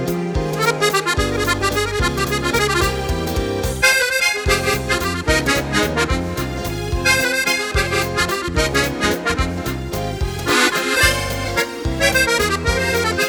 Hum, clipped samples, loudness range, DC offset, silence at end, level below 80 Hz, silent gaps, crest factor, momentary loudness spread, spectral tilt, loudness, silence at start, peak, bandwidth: none; under 0.1%; 1 LU; under 0.1%; 0 s; -30 dBFS; none; 18 dB; 8 LU; -3.5 dB/octave; -18 LUFS; 0 s; -2 dBFS; over 20 kHz